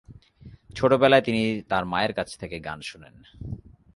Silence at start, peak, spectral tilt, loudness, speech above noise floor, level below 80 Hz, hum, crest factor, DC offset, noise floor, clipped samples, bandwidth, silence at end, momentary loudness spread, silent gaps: 0.1 s; -6 dBFS; -6 dB/octave; -23 LUFS; 25 dB; -50 dBFS; none; 20 dB; under 0.1%; -49 dBFS; under 0.1%; 11.5 kHz; 0.4 s; 21 LU; none